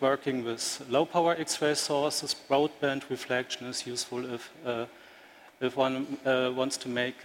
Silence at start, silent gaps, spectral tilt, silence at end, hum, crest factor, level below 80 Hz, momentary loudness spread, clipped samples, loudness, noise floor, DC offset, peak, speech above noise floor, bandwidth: 0 s; none; -3 dB/octave; 0 s; none; 18 dB; -74 dBFS; 8 LU; under 0.1%; -30 LUFS; -54 dBFS; under 0.1%; -12 dBFS; 24 dB; 16.5 kHz